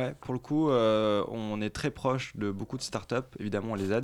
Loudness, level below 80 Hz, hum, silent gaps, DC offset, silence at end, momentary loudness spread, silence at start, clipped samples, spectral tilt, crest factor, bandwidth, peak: -31 LUFS; -58 dBFS; none; none; under 0.1%; 0 s; 10 LU; 0 s; under 0.1%; -6 dB/octave; 16 dB; 13.5 kHz; -14 dBFS